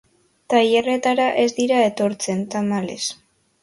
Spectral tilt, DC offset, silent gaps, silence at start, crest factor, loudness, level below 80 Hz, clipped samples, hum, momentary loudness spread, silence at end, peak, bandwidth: -4 dB/octave; under 0.1%; none; 0.5 s; 18 dB; -20 LUFS; -64 dBFS; under 0.1%; none; 8 LU; 0.5 s; -4 dBFS; 11.5 kHz